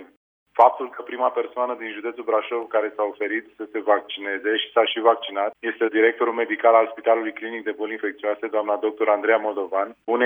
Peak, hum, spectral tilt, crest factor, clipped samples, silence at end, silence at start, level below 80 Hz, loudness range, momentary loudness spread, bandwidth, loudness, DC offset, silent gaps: -2 dBFS; none; -5 dB/octave; 20 dB; under 0.1%; 0 s; 0 s; -78 dBFS; 4 LU; 11 LU; 3.8 kHz; -23 LUFS; under 0.1%; 0.17-0.46 s